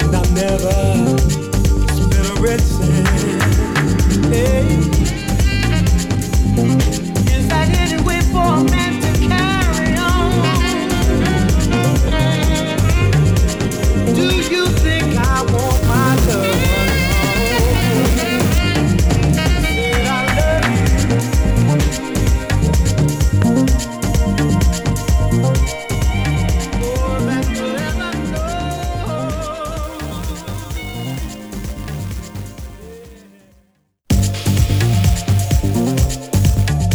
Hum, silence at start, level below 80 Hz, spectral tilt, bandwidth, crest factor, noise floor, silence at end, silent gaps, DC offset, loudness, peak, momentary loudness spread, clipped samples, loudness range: none; 0 s; -20 dBFS; -5.5 dB/octave; over 20 kHz; 14 dB; -58 dBFS; 0 s; none; under 0.1%; -16 LUFS; 0 dBFS; 8 LU; under 0.1%; 8 LU